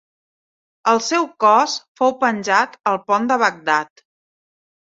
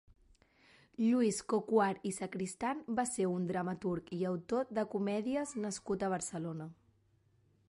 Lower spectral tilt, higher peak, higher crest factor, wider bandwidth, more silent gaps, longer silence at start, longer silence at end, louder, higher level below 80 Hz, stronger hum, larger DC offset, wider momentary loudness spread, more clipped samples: second, -3 dB/octave vs -5.5 dB/octave; first, 0 dBFS vs -18 dBFS; about the same, 18 dB vs 18 dB; second, 7.8 kHz vs 11.5 kHz; first, 1.88-1.95 s vs none; second, 0.85 s vs 1 s; about the same, 1.05 s vs 0.95 s; first, -18 LUFS vs -36 LUFS; about the same, -70 dBFS vs -70 dBFS; neither; neither; about the same, 7 LU vs 9 LU; neither